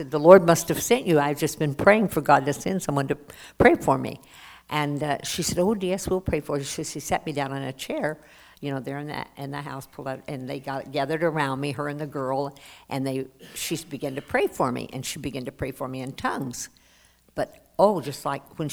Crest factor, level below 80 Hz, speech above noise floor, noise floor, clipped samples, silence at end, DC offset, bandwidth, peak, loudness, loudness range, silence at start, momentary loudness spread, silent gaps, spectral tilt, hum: 24 dB; -52 dBFS; 34 dB; -58 dBFS; under 0.1%; 0 s; under 0.1%; over 20 kHz; 0 dBFS; -25 LUFS; 9 LU; 0 s; 15 LU; none; -5 dB/octave; none